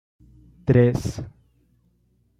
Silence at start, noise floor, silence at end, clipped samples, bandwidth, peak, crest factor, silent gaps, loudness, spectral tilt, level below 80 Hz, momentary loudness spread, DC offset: 0.65 s; -64 dBFS; 1.1 s; under 0.1%; 11.5 kHz; -6 dBFS; 20 dB; none; -21 LUFS; -8 dB/octave; -48 dBFS; 19 LU; under 0.1%